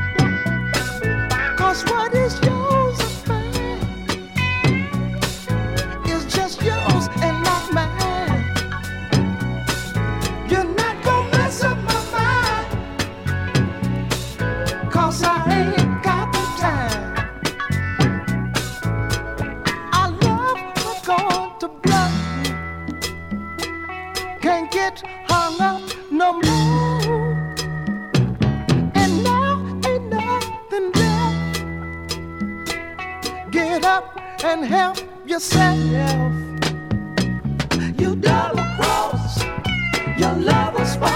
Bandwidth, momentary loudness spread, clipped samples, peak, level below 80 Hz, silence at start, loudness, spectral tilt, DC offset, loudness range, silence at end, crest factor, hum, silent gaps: 17.5 kHz; 9 LU; under 0.1%; -2 dBFS; -36 dBFS; 0 s; -20 LUFS; -5 dB/octave; under 0.1%; 3 LU; 0 s; 18 dB; none; none